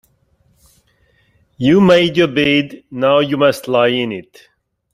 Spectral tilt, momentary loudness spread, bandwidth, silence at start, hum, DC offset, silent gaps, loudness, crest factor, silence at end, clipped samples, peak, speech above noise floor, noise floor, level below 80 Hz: -6 dB/octave; 10 LU; 15 kHz; 1.6 s; none; under 0.1%; none; -14 LUFS; 14 dB; 0.7 s; under 0.1%; -2 dBFS; 44 dB; -58 dBFS; -52 dBFS